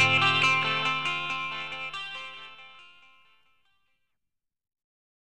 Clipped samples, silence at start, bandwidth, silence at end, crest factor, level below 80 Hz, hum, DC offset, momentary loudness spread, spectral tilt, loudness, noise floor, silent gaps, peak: under 0.1%; 0 s; 12 kHz; 2.4 s; 20 dB; -68 dBFS; none; under 0.1%; 22 LU; -3 dB/octave; -25 LUFS; -86 dBFS; none; -10 dBFS